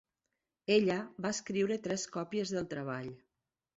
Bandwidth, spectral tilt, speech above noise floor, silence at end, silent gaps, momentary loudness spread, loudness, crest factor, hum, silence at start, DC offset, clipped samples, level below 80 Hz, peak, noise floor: 8.2 kHz; -4.5 dB/octave; 53 dB; 0.6 s; none; 12 LU; -34 LUFS; 20 dB; none; 0.7 s; under 0.1%; under 0.1%; -72 dBFS; -16 dBFS; -87 dBFS